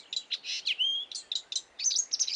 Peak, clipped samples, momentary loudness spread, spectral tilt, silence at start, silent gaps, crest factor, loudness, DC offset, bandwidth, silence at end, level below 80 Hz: -14 dBFS; under 0.1%; 7 LU; 5.5 dB/octave; 0 s; none; 18 dB; -30 LUFS; under 0.1%; 11.5 kHz; 0 s; -84 dBFS